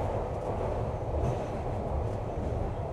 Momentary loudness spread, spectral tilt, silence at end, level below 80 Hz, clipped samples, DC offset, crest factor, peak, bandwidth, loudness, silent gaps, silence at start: 2 LU; -8.5 dB/octave; 0 s; -38 dBFS; under 0.1%; under 0.1%; 12 dB; -18 dBFS; 11 kHz; -33 LUFS; none; 0 s